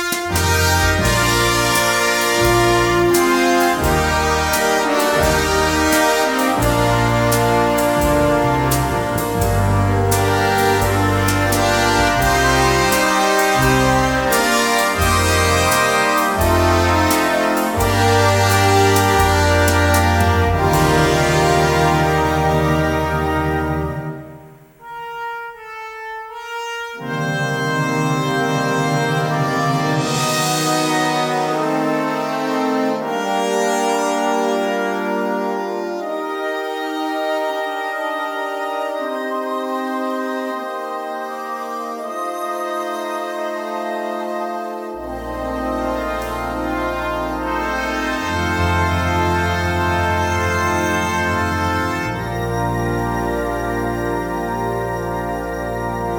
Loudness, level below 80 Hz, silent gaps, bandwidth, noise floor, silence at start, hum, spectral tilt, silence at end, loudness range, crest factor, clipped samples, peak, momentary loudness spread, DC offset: -17 LUFS; -32 dBFS; none; 18 kHz; -41 dBFS; 0 s; none; -4.5 dB/octave; 0 s; 9 LU; 16 dB; under 0.1%; -2 dBFS; 10 LU; under 0.1%